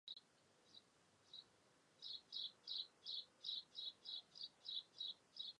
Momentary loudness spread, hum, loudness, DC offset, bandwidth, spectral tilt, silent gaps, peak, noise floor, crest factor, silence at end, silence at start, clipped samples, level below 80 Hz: 12 LU; none; -51 LUFS; under 0.1%; 10.5 kHz; -0.5 dB/octave; none; -36 dBFS; -75 dBFS; 18 dB; 0.05 s; 0.05 s; under 0.1%; under -90 dBFS